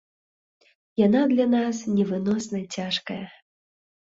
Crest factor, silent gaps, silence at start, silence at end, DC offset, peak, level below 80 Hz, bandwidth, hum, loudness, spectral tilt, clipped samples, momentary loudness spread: 18 dB; none; 1 s; 0.75 s; under 0.1%; -8 dBFS; -66 dBFS; 8 kHz; none; -24 LUFS; -5.5 dB/octave; under 0.1%; 14 LU